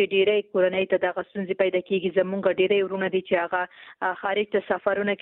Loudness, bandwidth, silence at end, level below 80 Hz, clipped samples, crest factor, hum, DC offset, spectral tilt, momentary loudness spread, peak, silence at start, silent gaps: -24 LUFS; 4 kHz; 0.05 s; -66 dBFS; under 0.1%; 14 dB; none; under 0.1%; -9.5 dB/octave; 7 LU; -10 dBFS; 0 s; none